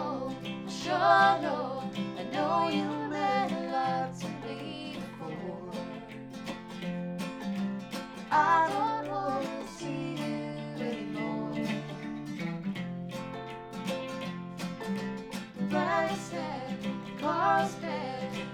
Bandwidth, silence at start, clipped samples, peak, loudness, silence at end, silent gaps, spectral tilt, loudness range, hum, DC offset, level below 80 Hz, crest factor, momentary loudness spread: 17 kHz; 0 s; under 0.1%; -10 dBFS; -32 LUFS; 0 s; none; -5.5 dB/octave; 9 LU; none; under 0.1%; -64 dBFS; 22 dB; 13 LU